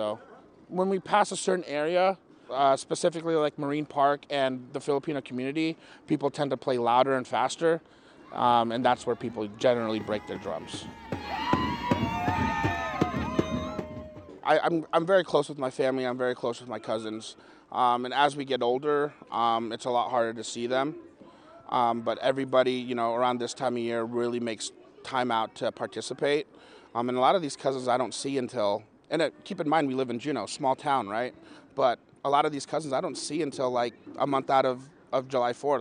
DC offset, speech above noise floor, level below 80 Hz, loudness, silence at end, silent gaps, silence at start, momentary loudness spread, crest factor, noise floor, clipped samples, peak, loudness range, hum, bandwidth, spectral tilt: under 0.1%; 24 dB; -58 dBFS; -28 LUFS; 0 s; none; 0 s; 10 LU; 20 dB; -52 dBFS; under 0.1%; -8 dBFS; 3 LU; none; 10.5 kHz; -5 dB/octave